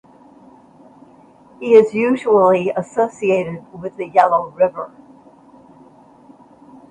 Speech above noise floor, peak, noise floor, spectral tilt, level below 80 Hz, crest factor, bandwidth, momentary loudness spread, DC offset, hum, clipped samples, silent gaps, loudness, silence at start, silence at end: 31 dB; 0 dBFS; -47 dBFS; -7 dB/octave; -62 dBFS; 18 dB; 9.2 kHz; 17 LU; under 0.1%; none; under 0.1%; none; -16 LUFS; 1.6 s; 2.05 s